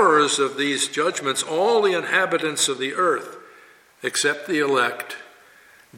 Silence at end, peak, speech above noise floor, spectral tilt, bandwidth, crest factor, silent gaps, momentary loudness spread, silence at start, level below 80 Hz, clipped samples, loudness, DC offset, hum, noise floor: 0 s; -4 dBFS; 30 dB; -2 dB/octave; 16.5 kHz; 18 dB; none; 10 LU; 0 s; -74 dBFS; under 0.1%; -21 LUFS; under 0.1%; none; -51 dBFS